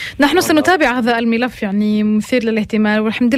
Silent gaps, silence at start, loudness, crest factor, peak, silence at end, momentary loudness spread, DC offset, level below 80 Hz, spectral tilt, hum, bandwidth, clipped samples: none; 0 s; -15 LUFS; 12 dB; -2 dBFS; 0 s; 5 LU; under 0.1%; -46 dBFS; -5 dB/octave; none; 15.5 kHz; under 0.1%